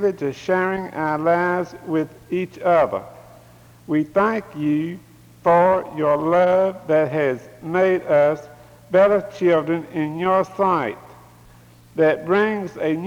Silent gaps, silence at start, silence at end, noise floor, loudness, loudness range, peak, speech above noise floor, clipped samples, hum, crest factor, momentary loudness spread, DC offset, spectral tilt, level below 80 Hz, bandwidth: none; 0 s; 0 s; -48 dBFS; -20 LUFS; 4 LU; -6 dBFS; 29 dB; under 0.1%; none; 14 dB; 10 LU; under 0.1%; -7.5 dB/octave; -58 dBFS; 18.5 kHz